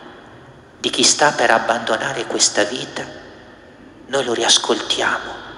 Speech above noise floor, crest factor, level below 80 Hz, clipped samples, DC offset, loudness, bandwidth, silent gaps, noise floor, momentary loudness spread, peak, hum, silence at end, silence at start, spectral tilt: 25 dB; 20 dB; -56 dBFS; under 0.1%; under 0.1%; -17 LUFS; 12 kHz; none; -43 dBFS; 12 LU; 0 dBFS; none; 0 s; 0 s; -1 dB/octave